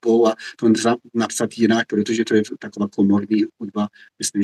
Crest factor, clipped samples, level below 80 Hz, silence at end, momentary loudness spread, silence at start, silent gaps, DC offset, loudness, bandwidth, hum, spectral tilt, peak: 16 dB; under 0.1%; -72 dBFS; 0 s; 9 LU; 0.05 s; none; under 0.1%; -20 LUFS; 12.5 kHz; none; -5 dB/octave; -4 dBFS